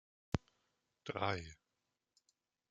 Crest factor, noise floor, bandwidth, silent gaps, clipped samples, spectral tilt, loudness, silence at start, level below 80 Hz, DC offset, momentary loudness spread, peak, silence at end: 28 dB; -88 dBFS; 9.2 kHz; none; under 0.1%; -6 dB/octave; -42 LUFS; 0.35 s; -64 dBFS; under 0.1%; 13 LU; -18 dBFS; 1.15 s